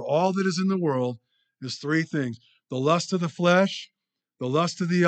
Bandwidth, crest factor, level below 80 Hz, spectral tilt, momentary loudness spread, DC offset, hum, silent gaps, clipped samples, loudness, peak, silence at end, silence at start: 9 kHz; 18 dB; -80 dBFS; -6 dB/octave; 14 LU; under 0.1%; none; none; under 0.1%; -25 LUFS; -8 dBFS; 0 s; 0 s